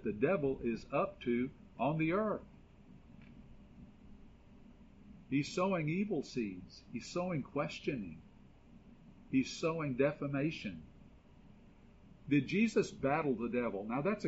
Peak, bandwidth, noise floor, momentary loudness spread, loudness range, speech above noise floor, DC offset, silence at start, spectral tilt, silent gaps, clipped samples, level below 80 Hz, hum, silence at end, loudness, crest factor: -20 dBFS; 7.6 kHz; -60 dBFS; 16 LU; 5 LU; 24 dB; under 0.1%; 0 s; -6 dB/octave; none; under 0.1%; -62 dBFS; none; 0 s; -36 LUFS; 18 dB